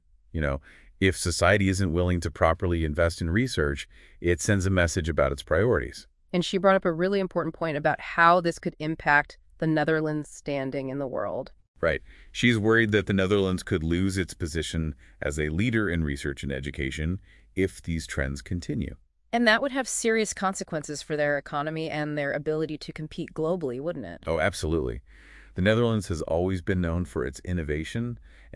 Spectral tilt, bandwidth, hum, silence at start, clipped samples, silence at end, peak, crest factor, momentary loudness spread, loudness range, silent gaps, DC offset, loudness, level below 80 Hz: -5.5 dB/octave; 12 kHz; none; 0.35 s; under 0.1%; 0 s; -4 dBFS; 22 dB; 11 LU; 5 LU; 11.68-11.74 s; under 0.1%; -27 LUFS; -44 dBFS